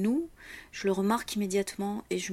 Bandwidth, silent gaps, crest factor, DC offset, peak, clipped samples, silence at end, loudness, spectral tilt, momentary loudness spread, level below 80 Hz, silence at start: 16 kHz; none; 16 dB; under 0.1%; -16 dBFS; under 0.1%; 0 s; -31 LUFS; -5 dB/octave; 13 LU; -60 dBFS; 0 s